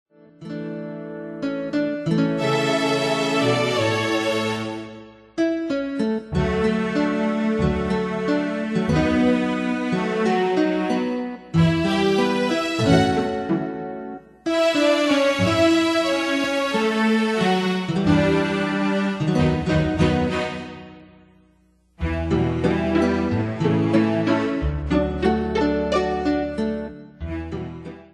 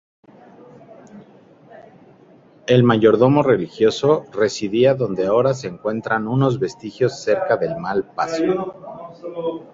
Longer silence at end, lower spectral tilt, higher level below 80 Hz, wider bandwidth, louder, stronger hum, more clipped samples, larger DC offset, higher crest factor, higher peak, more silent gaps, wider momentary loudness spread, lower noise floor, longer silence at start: about the same, 0.1 s vs 0.1 s; about the same, -6 dB/octave vs -6.5 dB/octave; first, -40 dBFS vs -56 dBFS; first, 12.5 kHz vs 7.8 kHz; about the same, -21 LUFS vs -19 LUFS; neither; neither; neither; about the same, 18 dB vs 18 dB; about the same, -4 dBFS vs -2 dBFS; neither; about the same, 13 LU vs 13 LU; first, -59 dBFS vs -49 dBFS; second, 0.4 s vs 1.15 s